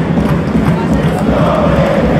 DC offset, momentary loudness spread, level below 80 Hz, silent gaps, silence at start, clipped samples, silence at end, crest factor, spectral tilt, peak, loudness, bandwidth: under 0.1%; 2 LU; -24 dBFS; none; 0 s; under 0.1%; 0 s; 10 dB; -8 dB/octave; 0 dBFS; -12 LUFS; 14 kHz